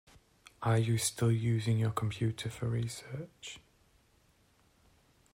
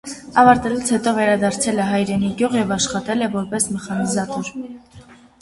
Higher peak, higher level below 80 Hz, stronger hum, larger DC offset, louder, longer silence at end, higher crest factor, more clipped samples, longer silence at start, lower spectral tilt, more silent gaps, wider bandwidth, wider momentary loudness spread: second, -18 dBFS vs 0 dBFS; second, -62 dBFS vs -50 dBFS; neither; neither; second, -33 LUFS vs -19 LUFS; first, 1.75 s vs 0.3 s; about the same, 16 dB vs 18 dB; neither; first, 0.6 s vs 0.05 s; first, -5.5 dB/octave vs -4 dB/octave; neither; first, 16 kHz vs 11.5 kHz; first, 16 LU vs 10 LU